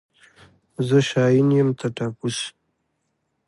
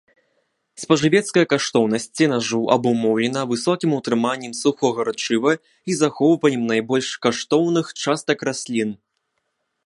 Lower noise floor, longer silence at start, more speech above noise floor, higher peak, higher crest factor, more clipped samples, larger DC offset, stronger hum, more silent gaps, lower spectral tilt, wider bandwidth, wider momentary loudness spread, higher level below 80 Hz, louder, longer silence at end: about the same, -73 dBFS vs -74 dBFS; about the same, 0.8 s vs 0.8 s; about the same, 54 dB vs 54 dB; second, -6 dBFS vs 0 dBFS; about the same, 16 dB vs 20 dB; neither; neither; neither; neither; first, -6 dB/octave vs -4.5 dB/octave; about the same, 11.5 kHz vs 11.5 kHz; first, 12 LU vs 6 LU; about the same, -64 dBFS vs -64 dBFS; about the same, -21 LUFS vs -20 LUFS; about the same, 1 s vs 0.9 s